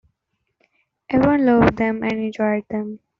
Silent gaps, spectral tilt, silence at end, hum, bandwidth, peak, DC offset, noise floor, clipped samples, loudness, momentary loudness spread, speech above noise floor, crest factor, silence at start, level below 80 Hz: none; -6.5 dB/octave; 0.2 s; none; 7 kHz; -2 dBFS; under 0.1%; -74 dBFS; under 0.1%; -19 LUFS; 9 LU; 56 dB; 18 dB; 1.1 s; -44 dBFS